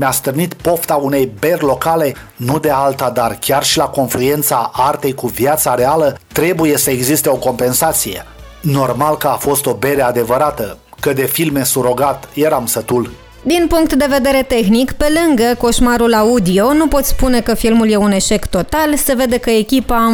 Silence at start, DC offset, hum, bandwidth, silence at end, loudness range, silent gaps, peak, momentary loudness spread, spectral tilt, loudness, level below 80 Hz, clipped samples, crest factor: 0 s; under 0.1%; none; over 20 kHz; 0 s; 3 LU; none; -2 dBFS; 5 LU; -4.5 dB/octave; -13 LUFS; -30 dBFS; under 0.1%; 12 dB